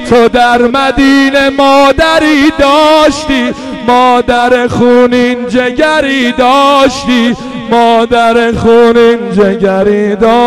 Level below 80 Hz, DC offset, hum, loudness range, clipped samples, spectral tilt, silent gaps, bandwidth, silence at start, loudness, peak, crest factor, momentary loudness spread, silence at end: -32 dBFS; 0.9%; none; 2 LU; under 0.1%; -5 dB/octave; none; 14 kHz; 0 s; -7 LUFS; 0 dBFS; 6 dB; 5 LU; 0 s